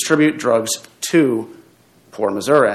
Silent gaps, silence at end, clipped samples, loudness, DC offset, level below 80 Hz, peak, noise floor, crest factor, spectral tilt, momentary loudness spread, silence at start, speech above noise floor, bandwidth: none; 0 s; under 0.1%; -18 LUFS; under 0.1%; -66 dBFS; 0 dBFS; -51 dBFS; 18 dB; -4.5 dB/octave; 10 LU; 0 s; 35 dB; 14.5 kHz